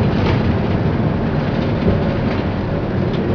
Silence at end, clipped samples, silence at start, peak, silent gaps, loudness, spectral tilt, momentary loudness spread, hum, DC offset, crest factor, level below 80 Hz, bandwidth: 0 s; under 0.1%; 0 s; -4 dBFS; none; -18 LUFS; -9 dB/octave; 4 LU; none; under 0.1%; 14 dB; -28 dBFS; 5.4 kHz